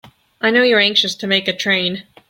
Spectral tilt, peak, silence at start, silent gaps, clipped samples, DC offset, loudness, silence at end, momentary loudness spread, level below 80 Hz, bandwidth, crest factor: -3.5 dB/octave; -2 dBFS; 0.05 s; none; under 0.1%; under 0.1%; -15 LUFS; 0.3 s; 6 LU; -62 dBFS; 16.5 kHz; 16 dB